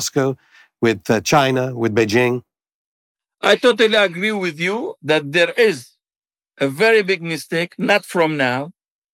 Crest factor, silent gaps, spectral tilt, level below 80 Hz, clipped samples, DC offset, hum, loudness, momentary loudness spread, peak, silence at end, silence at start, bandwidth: 14 dB; 2.74-3.15 s; -4.5 dB/octave; -62 dBFS; under 0.1%; under 0.1%; none; -17 LUFS; 9 LU; -4 dBFS; 0.4 s; 0 s; 17.5 kHz